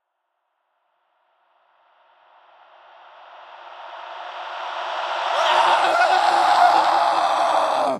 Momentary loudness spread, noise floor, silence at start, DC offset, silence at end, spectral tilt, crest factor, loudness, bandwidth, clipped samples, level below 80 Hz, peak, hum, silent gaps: 20 LU; -75 dBFS; 3.3 s; under 0.1%; 0 s; -1 dB/octave; 18 dB; -18 LUFS; 14 kHz; under 0.1%; -74 dBFS; -4 dBFS; none; none